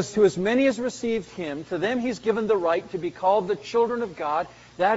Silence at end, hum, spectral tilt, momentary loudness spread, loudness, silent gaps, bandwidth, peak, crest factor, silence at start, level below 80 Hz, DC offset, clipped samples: 0 s; none; -4 dB/octave; 8 LU; -25 LUFS; none; 8 kHz; -8 dBFS; 16 dB; 0 s; -58 dBFS; under 0.1%; under 0.1%